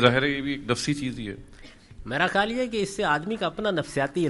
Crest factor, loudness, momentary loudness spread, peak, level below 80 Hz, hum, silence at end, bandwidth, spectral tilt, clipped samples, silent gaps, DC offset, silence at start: 24 dB; -26 LUFS; 11 LU; -2 dBFS; -50 dBFS; none; 0 s; 11.5 kHz; -5 dB/octave; under 0.1%; none; under 0.1%; 0 s